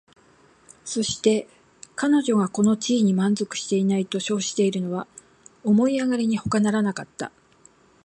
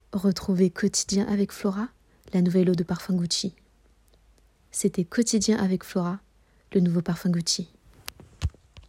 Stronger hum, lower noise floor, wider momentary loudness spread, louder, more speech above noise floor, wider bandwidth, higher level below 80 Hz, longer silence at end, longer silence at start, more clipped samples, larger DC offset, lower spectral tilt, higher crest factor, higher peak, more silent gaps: neither; second, -56 dBFS vs -60 dBFS; about the same, 12 LU vs 12 LU; first, -23 LUFS vs -26 LUFS; about the same, 34 dB vs 35 dB; second, 10 kHz vs 15.5 kHz; second, -60 dBFS vs -50 dBFS; first, 0.75 s vs 0.1 s; first, 0.85 s vs 0.1 s; neither; neither; about the same, -5 dB/octave vs -5 dB/octave; about the same, 18 dB vs 16 dB; first, -6 dBFS vs -10 dBFS; neither